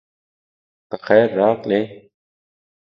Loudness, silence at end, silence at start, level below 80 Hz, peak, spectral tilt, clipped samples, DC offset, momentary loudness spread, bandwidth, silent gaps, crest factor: -17 LUFS; 0.95 s; 0.9 s; -66 dBFS; 0 dBFS; -8.5 dB/octave; under 0.1%; under 0.1%; 17 LU; 5.8 kHz; none; 20 dB